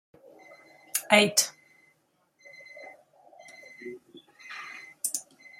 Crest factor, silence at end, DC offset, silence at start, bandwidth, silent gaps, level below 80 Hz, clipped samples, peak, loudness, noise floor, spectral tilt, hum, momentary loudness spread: 28 dB; 0.4 s; under 0.1%; 0.95 s; 16 kHz; none; -80 dBFS; under 0.1%; -4 dBFS; -26 LUFS; -70 dBFS; -1.5 dB/octave; none; 28 LU